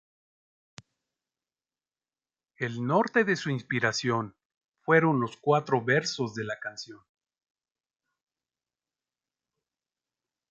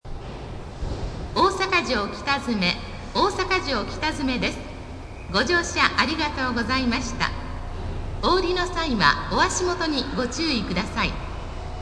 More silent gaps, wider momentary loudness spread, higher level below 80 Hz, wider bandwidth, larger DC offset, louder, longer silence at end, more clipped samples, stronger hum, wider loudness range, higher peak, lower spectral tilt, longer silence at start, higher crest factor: first, 4.45-4.50 s, 4.57-4.61 s, 4.68-4.72 s vs none; about the same, 14 LU vs 15 LU; second, -74 dBFS vs -36 dBFS; second, 7.8 kHz vs 11 kHz; neither; second, -27 LUFS vs -23 LUFS; first, 3.55 s vs 0 s; neither; neither; first, 10 LU vs 2 LU; second, -8 dBFS vs -2 dBFS; first, -5.5 dB/octave vs -4 dB/octave; first, 2.6 s vs 0.05 s; about the same, 22 dB vs 22 dB